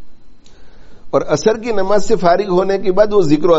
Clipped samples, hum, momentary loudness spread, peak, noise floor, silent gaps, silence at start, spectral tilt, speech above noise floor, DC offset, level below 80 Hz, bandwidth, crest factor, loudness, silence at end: under 0.1%; none; 5 LU; 0 dBFS; -33 dBFS; none; 0 s; -5.5 dB/octave; 21 dB; under 0.1%; -38 dBFS; 8 kHz; 14 dB; -15 LUFS; 0 s